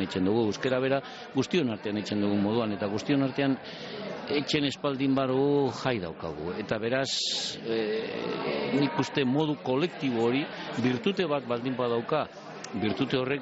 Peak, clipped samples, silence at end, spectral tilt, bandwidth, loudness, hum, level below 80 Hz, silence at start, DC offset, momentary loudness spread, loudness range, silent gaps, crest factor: -14 dBFS; under 0.1%; 0 s; -4.5 dB/octave; 8 kHz; -29 LUFS; none; -64 dBFS; 0 s; under 0.1%; 7 LU; 1 LU; none; 14 dB